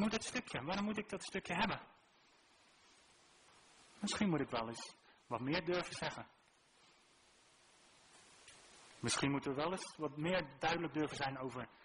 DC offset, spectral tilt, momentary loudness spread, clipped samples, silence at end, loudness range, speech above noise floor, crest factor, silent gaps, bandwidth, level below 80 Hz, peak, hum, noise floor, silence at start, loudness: under 0.1%; -4 dB/octave; 18 LU; under 0.1%; 0.1 s; 6 LU; 30 dB; 22 dB; none; 10.5 kHz; -68 dBFS; -22 dBFS; none; -70 dBFS; 0 s; -40 LUFS